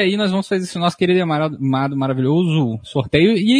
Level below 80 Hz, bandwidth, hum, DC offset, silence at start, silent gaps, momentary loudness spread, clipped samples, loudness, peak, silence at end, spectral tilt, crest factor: -50 dBFS; 11 kHz; none; under 0.1%; 0 s; none; 6 LU; under 0.1%; -18 LUFS; 0 dBFS; 0 s; -6.5 dB/octave; 16 dB